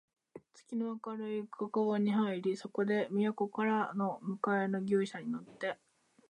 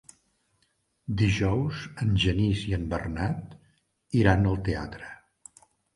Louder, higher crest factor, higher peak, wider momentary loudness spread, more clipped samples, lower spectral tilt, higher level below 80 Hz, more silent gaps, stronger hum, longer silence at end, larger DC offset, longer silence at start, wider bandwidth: second, -35 LUFS vs -27 LUFS; second, 16 dB vs 24 dB; second, -18 dBFS vs -4 dBFS; second, 8 LU vs 19 LU; neither; about the same, -7 dB/octave vs -6.5 dB/octave; second, -84 dBFS vs -40 dBFS; neither; neither; second, 0.55 s vs 0.8 s; neither; second, 0.35 s vs 1.1 s; second, 9.4 kHz vs 11 kHz